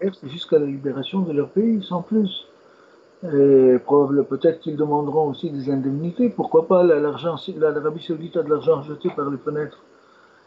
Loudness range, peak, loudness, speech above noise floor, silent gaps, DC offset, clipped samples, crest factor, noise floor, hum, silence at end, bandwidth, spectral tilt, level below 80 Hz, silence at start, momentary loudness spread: 4 LU; -4 dBFS; -21 LUFS; 32 dB; none; under 0.1%; under 0.1%; 16 dB; -52 dBFS; none; 0.75 s; 7.2 kHz; -9 dB/octave; -68 dBFS; 0 s; 11 LU